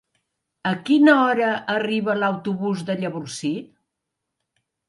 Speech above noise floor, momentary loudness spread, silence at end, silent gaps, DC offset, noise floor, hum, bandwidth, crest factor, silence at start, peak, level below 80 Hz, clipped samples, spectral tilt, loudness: 61 dB; 13 LU; 1.25 s; none; under 0.1%; -81 dBFS; none; 11.5 kHz; 20 dB; 0.65 s; -2 dBFS; -72 dBFS; under 0.1%; -5.5 dB/octave; -21 LUFS